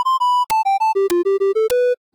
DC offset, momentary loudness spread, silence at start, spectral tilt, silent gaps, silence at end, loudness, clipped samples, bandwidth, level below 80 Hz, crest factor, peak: under 0.1%; 1 LU; 0 s; -3 dB/octave; none; 0.2 s; -17 LUFS; under 0.1%; 19.5 kHz; -58 dBFS; 8 dB; -10 dBFS